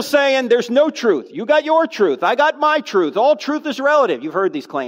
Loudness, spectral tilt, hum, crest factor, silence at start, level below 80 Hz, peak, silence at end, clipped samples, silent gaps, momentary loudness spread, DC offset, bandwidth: -16 LUFS; -4 dB/octave; none; 12 dB; 0 s; -80 dBFS; -4 dBFS; 0 s; under 0.1%; none; 5 LU; under 0.1%; 16 kHz